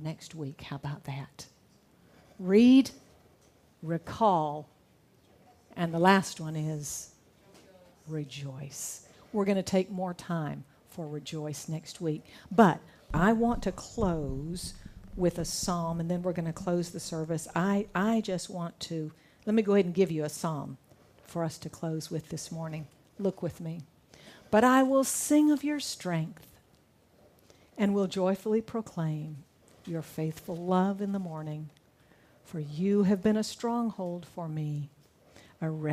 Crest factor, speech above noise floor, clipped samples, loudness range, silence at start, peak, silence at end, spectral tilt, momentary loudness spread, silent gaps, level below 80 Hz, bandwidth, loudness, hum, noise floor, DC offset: 24 dB; 34 dB; under 0.1%; 7 LU; 0 s; -8 dBFS; 0 s; -5.5 dB/octave; 17 LU; none; -54 dBFS; 15.5 kHz; -30 LUFS; none; -64 dBFS; under 0.1%